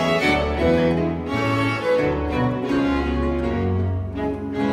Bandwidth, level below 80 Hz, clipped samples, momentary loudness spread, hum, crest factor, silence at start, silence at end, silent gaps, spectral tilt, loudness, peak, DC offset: 14.5 kHz; -34 dBFS; under 0.1%; 6 LU; none; 14 dB; 0 s; 0 s; none; -7 dB/octave; -21 LUFS; -6 dBFS; under 0.1%